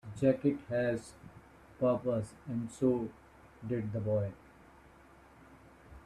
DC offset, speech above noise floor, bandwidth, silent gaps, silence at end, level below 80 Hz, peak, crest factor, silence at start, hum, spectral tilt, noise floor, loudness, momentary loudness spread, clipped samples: under 0.1%; 26 dB; 12 kHz; none; 0.05 s; -62 dBFS; -14 dBFS; 20 dB; 0.05 s; none; -8 dB/octave; -59 dBFS; -34 LUFS; 18 LU; under 0.1%